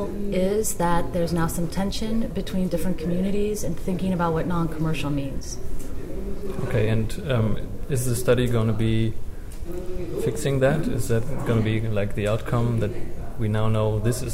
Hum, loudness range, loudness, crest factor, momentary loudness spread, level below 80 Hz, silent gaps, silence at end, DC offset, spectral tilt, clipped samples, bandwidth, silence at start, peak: none; 3 LU; -25 LUFS; 14 dB; 12 LU; -32 dBFS; none; 0 s; under 0.1%; -6.5 dB/octave; under 0.1%; 16 kHz; 0 s; -8 dBFS